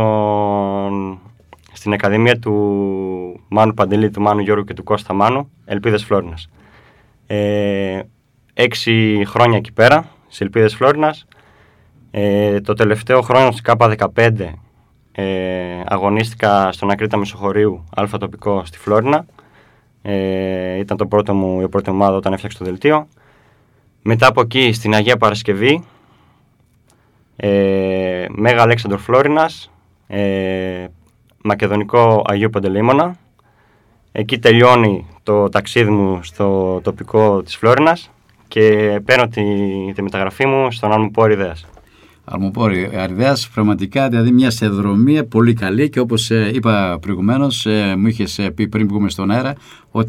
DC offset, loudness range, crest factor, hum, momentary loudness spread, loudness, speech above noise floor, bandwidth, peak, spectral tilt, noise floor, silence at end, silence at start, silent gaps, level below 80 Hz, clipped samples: under 0.1%; 4 LU; 16 dB; none; 10 LU; -15 LUFS; 40 dB; 15 kHz; 0 dBFS; -6.5 dB/octave; -55 dBFS; 0 s; 0 s; none; -48 dBFS; under 0.1%